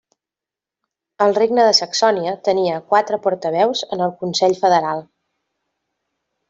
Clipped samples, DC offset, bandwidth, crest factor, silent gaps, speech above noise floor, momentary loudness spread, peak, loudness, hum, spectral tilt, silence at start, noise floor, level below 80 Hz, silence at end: under 0.1%; under 0.1%; 7.8 kHz; 18 dB; none; 71 dB; 7 LU; -2 dBFS; -17 LUFS; none; -3.5 dB/octave; 1.2 s; -88 dBFS; -66 dBFS; 1.45 s